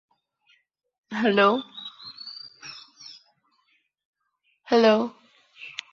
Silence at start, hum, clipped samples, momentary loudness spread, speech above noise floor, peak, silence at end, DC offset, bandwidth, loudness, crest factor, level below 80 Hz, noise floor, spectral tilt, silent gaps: 1.1 s; none; under 0.1%; 24 LU; 52 dB; -6 dBFS; 0.2 s; under 0.1%; 7.2 kHz; -22 LUFS; 22 dB; -74 dBFS; -72 dBFS; -5 dB/octave; 4.05-4.13 s